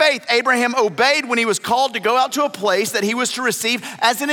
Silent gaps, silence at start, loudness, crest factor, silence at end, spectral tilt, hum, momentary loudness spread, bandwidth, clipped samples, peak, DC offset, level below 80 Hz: none; 0 s; -17 LUFS; 16 dB; 0 s; -2 dB/octave; none; 4 LU; 17 kHz; under 0.1%; -2 dBFS; under 0.1%; -76 dBFS